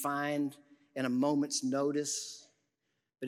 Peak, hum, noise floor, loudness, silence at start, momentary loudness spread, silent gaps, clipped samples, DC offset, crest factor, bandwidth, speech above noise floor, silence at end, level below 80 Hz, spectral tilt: -20 dBFS; none; -83 dBFS; -33 LUFS; 0 s; 13 LU; none; under 0.1%; under 0.1%; 16 dB; 16 kHz; 50 dB; 0 s; -90 dBFS; -4 dB/octave